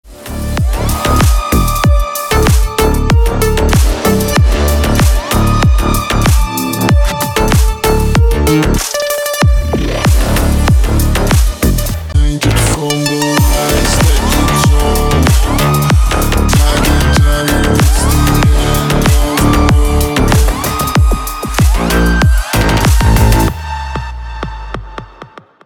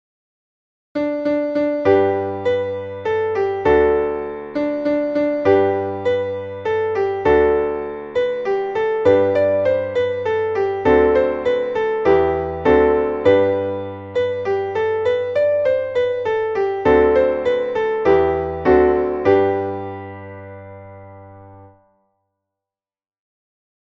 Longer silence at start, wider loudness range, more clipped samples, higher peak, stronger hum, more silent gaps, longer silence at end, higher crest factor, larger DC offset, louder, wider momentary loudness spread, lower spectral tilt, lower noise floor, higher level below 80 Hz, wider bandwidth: second, 0.05 s vs 0.95 s; about the same, 2 LU vs 3 LU; neither; about the same, 0 dBFS vs -2 dBFS; neither; neither; second, 0.4 s vs 2.15 s; second, 10 dB vs 16 dB; neither; first, -11 LUFS vs -18 LUFS; second, 5 LU vs 10 LU; second, -5 dB/octave vs -7.5 dB/octave; second, -35 dBFS vs under -90 dBFS; first, -14 dBFS vs -42 dBFS; first, 19.5 kHz vs 7 kHz